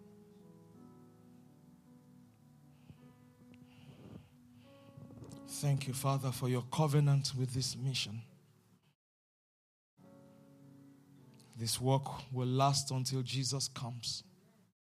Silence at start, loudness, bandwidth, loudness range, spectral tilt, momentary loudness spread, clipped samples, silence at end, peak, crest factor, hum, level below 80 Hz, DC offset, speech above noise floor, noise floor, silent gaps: 0 s; -35 LUFS; 14.5 kHz; 12 LU; -5 dB/octave; 25 LU; under 0.1%; 0.7 s; -18 dBFS; 22 dB; none; -72 dBFS; under 0.1%; 34 dB; -68 dBFS; 8.95-9.97 s